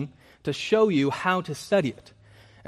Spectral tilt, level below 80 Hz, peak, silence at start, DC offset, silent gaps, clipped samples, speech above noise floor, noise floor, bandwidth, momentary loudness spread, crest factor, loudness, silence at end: -5.5 dB/octave; -64 dBFS; -8 dBFS; 0 s; under 0.1%; none; under 0.1%; 29 dB; -53 dBFS; 14 kHz; 12 LU; 18 dB; -25 LUFS; 0.75 s